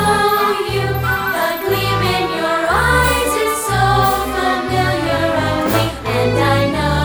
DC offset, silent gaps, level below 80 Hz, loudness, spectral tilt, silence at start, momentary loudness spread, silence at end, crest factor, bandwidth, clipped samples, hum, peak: under 0.1%; none; -30 dBFS; -16 LUFS; -4.5 dB/octave; 0 s; 4 LU; 0 s; 14 dB; over 20 kHz; under 0.1%; none; -2 dBFS